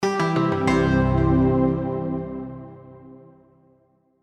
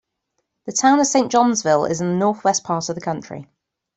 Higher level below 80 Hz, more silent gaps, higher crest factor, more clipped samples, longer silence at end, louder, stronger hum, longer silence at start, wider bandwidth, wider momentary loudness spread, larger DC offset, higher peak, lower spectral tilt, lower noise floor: first, -36 dBFS vs -62 dBFS; neither; about the same, 18 dB vs 18 dB; neither; first, 1.1 s vs 0.55 s; second, -21 LUFS vs -18 LUFS; neither; second, 0 s vs 0.65 s; first, 10 kHz vs 8.4 kHz; about the same, 16 LU vs 14 LU; neither; second, -6 dBFS vs -2 dBFS; first, -7.5 dB/octave vs -4 dB/octave; second, -62 dBFS vs -75 dBFS